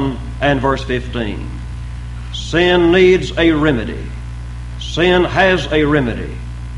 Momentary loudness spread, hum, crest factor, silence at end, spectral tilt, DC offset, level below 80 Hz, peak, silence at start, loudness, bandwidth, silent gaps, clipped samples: 17 LU; 60 Hz at -25 dBFS; 16 dB; 0 s; -6 dB/octave; under 0.1%; -28 dBFS; 0 dBFS; 0 s; -15 LUFS; 11 kHz; none; under 0.1%